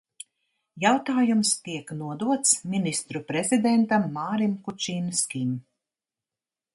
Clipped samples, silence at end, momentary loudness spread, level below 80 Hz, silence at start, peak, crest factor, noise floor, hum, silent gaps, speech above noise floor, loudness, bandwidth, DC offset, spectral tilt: under 0.1%; 1.15 s; 13 LU; -70 dBFS; 0.75 s; -6 dBFS; 20 dB; under -90 dBFS; none; none; over 65 dB; -25 LUFS; 11.5 kHz; under 0.1%; -3.5 dB/octave